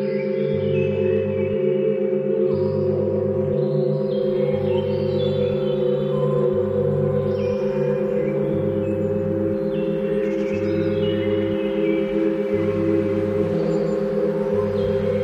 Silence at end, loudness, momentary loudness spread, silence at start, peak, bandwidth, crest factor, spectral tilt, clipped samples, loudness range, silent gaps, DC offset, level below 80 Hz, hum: 0 s; -21 LUFS; 2 LU; 0 s; -8 dBFS; 7.6 kHz; 12 dB; -9 dB/octave; under 0.1%; 1 LU; none; under 0.1%; -50 dBFS; none